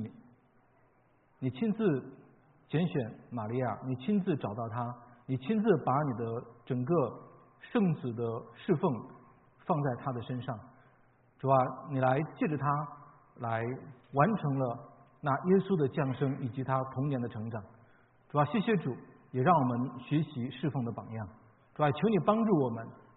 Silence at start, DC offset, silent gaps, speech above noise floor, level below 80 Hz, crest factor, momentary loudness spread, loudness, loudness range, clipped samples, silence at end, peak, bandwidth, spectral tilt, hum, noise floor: 0 s; under 0.1%; none; 36 dB; -70 dBFS; 22 dB; 13 LU; -32 LUFS; 3 LU; under 0.1%; 0.2 s; -10 dBFS; 4 kHz; -7.5 dB/octave; none; -67 dBFS